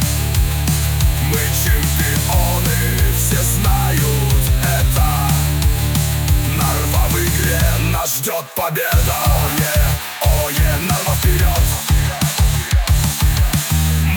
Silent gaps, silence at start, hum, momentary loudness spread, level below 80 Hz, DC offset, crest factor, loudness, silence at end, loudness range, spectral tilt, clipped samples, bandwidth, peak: none; 0 s; none; 2 LU; -20 dBFS; under 0.1%; 12 dB; -16 LUFS; 0 s; 1 LU; -4 dB/octave; under 0.1%; 19.5 kHz; -4 dBFS